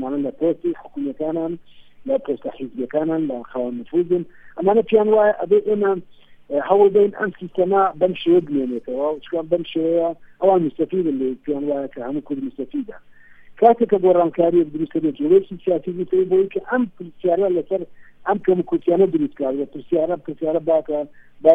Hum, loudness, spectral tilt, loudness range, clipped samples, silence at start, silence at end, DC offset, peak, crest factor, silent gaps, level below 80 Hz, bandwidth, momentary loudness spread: none; -20 LUFS; -9.5 dB/octave; 6 LU; under 0.1%; 0 s; 0 s; under 0.1%; 0 dBFS; 18 dB; none; -58 dBFS; 3.8 kHz; 11 LU